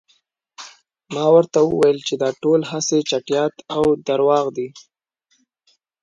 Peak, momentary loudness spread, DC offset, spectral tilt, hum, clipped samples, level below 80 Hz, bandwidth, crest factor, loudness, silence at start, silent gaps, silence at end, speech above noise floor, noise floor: -2 dBFS; 17 LU; under 0.1%; -4.5 dB/octave; none; under 0.1%; -58 dBFS; 10.5 kHz; 18 dB; -18 LUFS; 0.6 s; none; 1.25 s; 49 dB; -67 dBFS